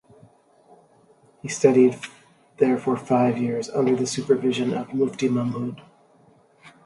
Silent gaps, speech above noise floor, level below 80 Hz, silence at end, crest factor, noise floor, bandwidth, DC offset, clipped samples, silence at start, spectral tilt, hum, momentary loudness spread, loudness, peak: none; 35 dB; -68 dBFS; 0.15 s; 20 dB; -57 dBFS; 11.5 kHz; under 0.1%; under 0.1%; 1.45 s; -6 dB/octave; none; 14 LU; -22 LUFS; -4 dBFS